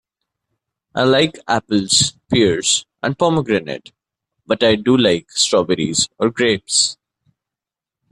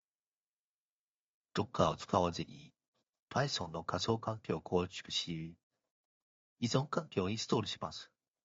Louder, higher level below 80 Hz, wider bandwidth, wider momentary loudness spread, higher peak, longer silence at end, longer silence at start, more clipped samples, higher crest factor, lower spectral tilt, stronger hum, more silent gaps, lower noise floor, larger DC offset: first, -16 LUFS vs -37 LUFS; first, -54 dBFS vs -68 dBFS; first, 12 kHz vs 7.6 kHz; second, 7 LU vs 11 LU; first, 0 dBFS vs -14 dBFS; first, 1.2 s vs 0.4 s; second, 0.95 s vs 1.55 s; neither; second, 18 dB vs 24 dB; second, -3 dB/octave vs -4.5 dB/octave; neither; second, none vs 2.88-2.93 s, 3.09-3.13 s, 3.19-3.28 s, 5.63-5.70 s, 5.91-6.56 s; about the same, -87 dBFS vs under -90 dBFS; neither